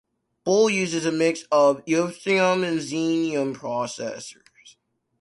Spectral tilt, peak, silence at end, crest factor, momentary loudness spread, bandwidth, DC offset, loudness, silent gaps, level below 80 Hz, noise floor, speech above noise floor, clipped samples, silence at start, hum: -4.5 dB/octave; -6 dBFS; 0.5 s; 16 dB; 12 LU; 11.5 kHz; under 0.1%; -23 LUFS; none; -68 dBFS; -62 dBFS; 40 dB; under 0.1%; 0.45 s; none